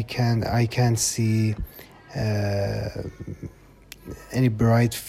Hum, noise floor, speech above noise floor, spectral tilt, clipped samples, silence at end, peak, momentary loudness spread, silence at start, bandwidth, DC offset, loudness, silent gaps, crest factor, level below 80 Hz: none; -47 dBFS; 24 dB; -5.5 dB/octave; under 0.1%; 0 s; -8 dBFS; 20 LU; 0 s; 15.5 kHz; under 0.1%; -23 LUFS; none; 16 dB; -44 dBFS